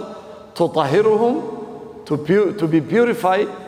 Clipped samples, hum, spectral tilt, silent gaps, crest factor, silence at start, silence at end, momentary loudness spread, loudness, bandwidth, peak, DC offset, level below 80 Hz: under 0.1%; none; -7 dB/octave; none; 16 dB; 0 s; 0 s; 18 LU; -18 LUFS; 15.5 kHz; -2 dBFS; under 0.1%; -60 dBFS